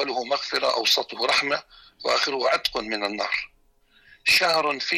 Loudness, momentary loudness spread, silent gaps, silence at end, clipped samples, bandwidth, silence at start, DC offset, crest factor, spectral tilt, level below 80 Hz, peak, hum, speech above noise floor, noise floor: -23 LUFS; 9 LU; none; 0 s; under 0.1%; 16 kHz; 0 s; under 0.1%; 16 dB; -1 dB/octave; -60 dBFS; -10 dBFS; none; 36 dB; -60 dBFS